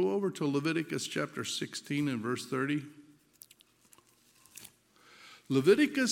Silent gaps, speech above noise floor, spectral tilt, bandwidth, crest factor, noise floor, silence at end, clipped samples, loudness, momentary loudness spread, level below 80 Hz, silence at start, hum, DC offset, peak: none; 34 dB; -4.5 dB/octave; 16.5 kHz; 20 dB; -65 dBFS; 0 s; under 0.1%; -31 LUFS; 25 LU; -80 dBFS; 0 s; none; under 0.1%; -12 dBFS